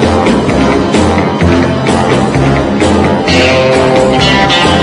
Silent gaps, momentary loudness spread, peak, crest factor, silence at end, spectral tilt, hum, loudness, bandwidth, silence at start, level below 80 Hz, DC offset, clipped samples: none; 3 LU; 0 dBFS; 8 dB; 0 s; -5.5 dB/octave; none; -8 LUFS; 11 kHz; 0 s; -26 dBFS; under 0.1%; 0.6%